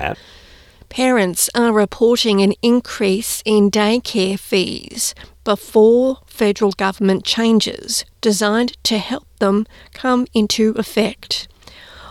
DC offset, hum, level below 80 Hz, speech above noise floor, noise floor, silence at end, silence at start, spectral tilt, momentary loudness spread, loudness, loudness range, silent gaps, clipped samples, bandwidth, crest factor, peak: under 0.1%; none; -48 dBFS; 24 dB; -41 dBFS; 0 s; 0 s; -4 dB/octave; 9 LU; -17 LUFS; 3 LU; none; under 0.1%; 16.5 kHz; 14 dB; -2 dBFS